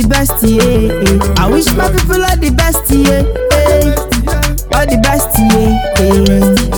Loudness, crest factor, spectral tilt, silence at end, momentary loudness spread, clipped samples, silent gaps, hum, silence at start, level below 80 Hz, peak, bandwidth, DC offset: -10 LUFS; 10 dB; -5 dB/octave; 0 s; 4 LU; 0.2%; none; none; 0 s; -16 dBFS; 0 dBFS; over 20 kHz; under 0.1%